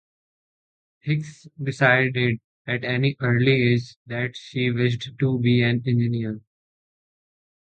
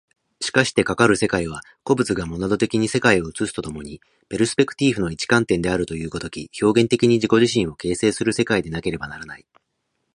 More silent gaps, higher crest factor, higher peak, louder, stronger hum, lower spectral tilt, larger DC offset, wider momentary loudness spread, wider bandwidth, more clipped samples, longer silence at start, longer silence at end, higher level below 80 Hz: first, 2.44-2.65 s, 3.96-4.05 s vs none; about the same, 20 dB vs 20 dB; second, -4 dBFS vs 0 dBFS; second, -23 LUFS vs -20 LUFS; neither; first, -7.5 dB/octave vs -5 dB/octave; neither; about the same, 13 LU vs 13 LU; second, 8.6 kHz vs 11.5 kHz; neither; first, 1.05 s vs 0.4 s; first, 1.35 s vs 0.8 s; second, -58 dBFS vs -46 dBFS